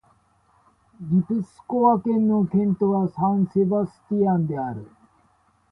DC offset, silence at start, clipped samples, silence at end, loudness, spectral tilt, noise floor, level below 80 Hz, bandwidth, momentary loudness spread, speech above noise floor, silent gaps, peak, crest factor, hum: under 0.1%; 1 s; under 0.1%; 0.85 s; -22 LUFS; -11.5 dB/octave; -62 dBFS; -60 dBFS; 2.2 kHz; 9 LU; 41 dB; none; -6 dBFS; 16 dB; none